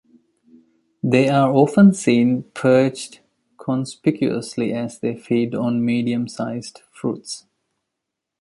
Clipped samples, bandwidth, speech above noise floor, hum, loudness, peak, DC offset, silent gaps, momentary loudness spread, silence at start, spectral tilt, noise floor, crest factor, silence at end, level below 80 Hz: under 0.1%; 11.5 kHz; 63 dB; none; -19 LUFS; -2 dBFS; under 0.1%; none; 17 LU; 1.05 s; -6.5 dB/octave; -82 dBFS; 18 dB; 1 s; -62 dBFS